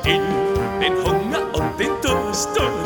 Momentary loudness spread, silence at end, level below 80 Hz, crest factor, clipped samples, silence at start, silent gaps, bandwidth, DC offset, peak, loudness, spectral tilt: 3 LU; 0 s; -34 dBFS; 18 dB; under 0.1%; 0 s; none; 19 kHz; under 0.1%; -2 dBFS; -20 LUFS; -4 dB/octave